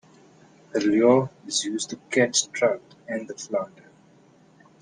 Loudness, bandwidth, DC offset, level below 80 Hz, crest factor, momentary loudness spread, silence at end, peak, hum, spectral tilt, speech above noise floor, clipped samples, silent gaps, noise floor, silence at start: -24 LUFS; 10.5 kHz; under 0.1%; -70 dBFS; 20 dB; 14 LU; 1.15 s; -6 dBFS; none; -3.5 dB/octave; 32 dB; under 0.1%; none; -56 dBFS; 0.75 s